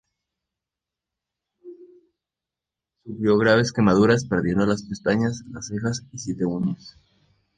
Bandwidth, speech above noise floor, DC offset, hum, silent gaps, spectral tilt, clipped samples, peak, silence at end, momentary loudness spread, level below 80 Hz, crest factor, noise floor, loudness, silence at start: 9.4 kHz; 66 dB; under 0.1%; none; none; -6 dB/octave; under 0.1%; -4 dBFS; 0.7 s; 14 LU; -52 dBFS; 20 dB; -88 dBFS; -22 LUFS; 1.65 s